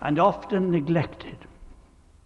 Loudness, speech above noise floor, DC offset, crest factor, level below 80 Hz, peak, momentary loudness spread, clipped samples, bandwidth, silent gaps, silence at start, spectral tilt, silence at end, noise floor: -24 LUFS; 30 dB; under 0.1%; 18 dB; -50 dBFS; -8 dBFS; 20 LU; under 0.1%; 7.2 kHz; none; 0 s; -8.5 dB/octave; 0.55 s; -54 dBFS